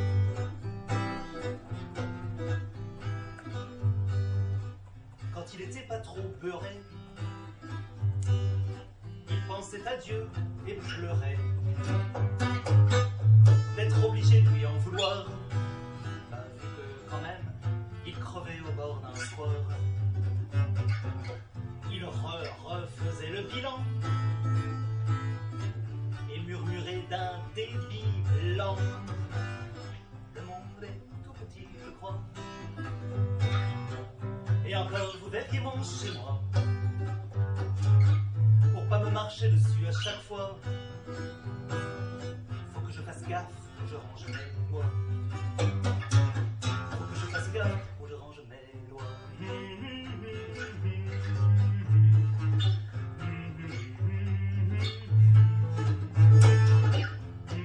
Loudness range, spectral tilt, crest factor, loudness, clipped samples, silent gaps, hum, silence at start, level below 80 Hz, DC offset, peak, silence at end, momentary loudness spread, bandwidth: 13 LU; -6.5 dB/octave; 18 dB; -30 LUFS; under 0.1%; none; none; 0 s; -54 dBFS; under 0.1%; -10 dBFS; 0 s; 18 LU; 8.8 kHz